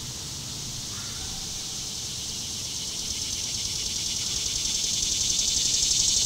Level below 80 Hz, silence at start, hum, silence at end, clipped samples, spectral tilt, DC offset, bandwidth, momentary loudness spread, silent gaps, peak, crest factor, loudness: -46 dBFS; 0 s; none; 0 s; under 0.1%; 0 dB/octave; under 0.1%; 16 kHz; 11 LU; none; -8 dBFS; 22 dB; -26 LUFS